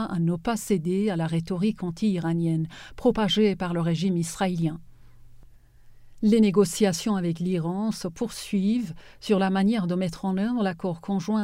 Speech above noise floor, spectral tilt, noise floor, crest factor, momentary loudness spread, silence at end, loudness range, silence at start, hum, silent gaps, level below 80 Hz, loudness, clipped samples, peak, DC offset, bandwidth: 25 dB; -6 dB/octave; -50 dBFS; 18 dB; 8 LU; 0 s; 2 LU; 0 s; none; none; -52 dBFS; -25 LUFS; under 0.1%; -8 dBFS; under 0.1%; 16 kHz